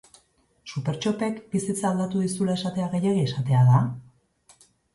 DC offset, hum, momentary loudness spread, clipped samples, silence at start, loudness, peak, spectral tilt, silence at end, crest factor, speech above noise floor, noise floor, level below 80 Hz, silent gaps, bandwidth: under 0.1%; none; 12 LU; under 0.1%; 0.65 s; -24 LUFS; -8 dBFS; -6.5 dB/octave; 0.95 s; 18 dB; 40 dB; -63 dBFS; -60 dBFS; none; 11.5 kHz